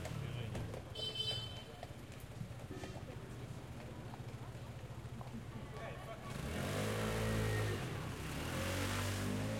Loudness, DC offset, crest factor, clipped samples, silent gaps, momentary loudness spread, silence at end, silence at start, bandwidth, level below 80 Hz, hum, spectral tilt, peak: -43 LUFS; under 0.1%; 16 dB; under 0.1%; none; 11 LU; 0 s; 0 s; 16.5 kHz; -54 dBFS; none; -5 dB/octave; -26 dBFS